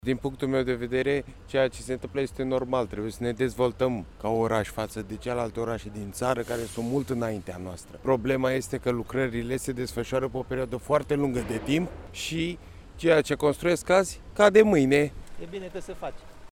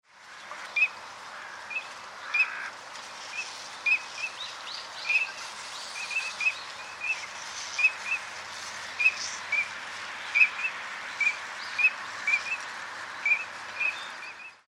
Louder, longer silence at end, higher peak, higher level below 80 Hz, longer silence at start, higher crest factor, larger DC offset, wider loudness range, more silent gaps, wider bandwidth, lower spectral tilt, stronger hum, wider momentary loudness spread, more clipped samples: about the same, -27 LUFS vs -28 LUFS; about the same, 0.05 s vs 0.1 s; about the same, -6 dBFS vs -8 dBFS; first, -48 dBFS vs -78 dBFS; about the same, 0.05 s vs 0.15 s; about the same, 22 dB vs 24 dB; neither; about the same, 6 LU vs 4 LU; neither; first, 17 kHz vs 14 kHz; first, -5.5 dB/octave vs 1 dB/octave; neither; about the same, 13 LU vs 15 LU; neither